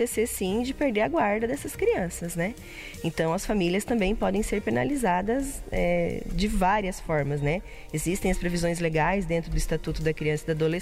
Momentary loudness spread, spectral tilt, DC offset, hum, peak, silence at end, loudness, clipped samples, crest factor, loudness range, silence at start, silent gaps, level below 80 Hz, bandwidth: 6 LU; -5.5 dB/octave; under 0.1%; none; -12 dBFS; 0 s; -27 LUFS; under 0.1%; 14 dB; 1 LU; 0 s; none; -38 dBFS; 16 kHz